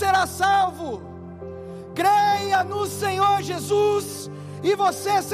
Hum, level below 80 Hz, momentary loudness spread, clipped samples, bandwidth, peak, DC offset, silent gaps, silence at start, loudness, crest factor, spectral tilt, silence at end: none; -62 dBFS; 17 LU; under 0.1%; 15.5 kHz; -10 dBFS; under 0.1%; none; 0 s; -22 LUFS; 12 dB; -4 dB/octave; 0 s